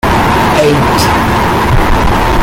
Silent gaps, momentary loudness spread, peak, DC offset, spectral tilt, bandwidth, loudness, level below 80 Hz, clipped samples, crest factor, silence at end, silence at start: none; 2 LU; 0 dBFS; under 0.1%; -5.5 dB/octave; 17 kHz; -9 LUFS; -18 dBFS; under 0.1%; 8 dB; 0 s; 0.05 s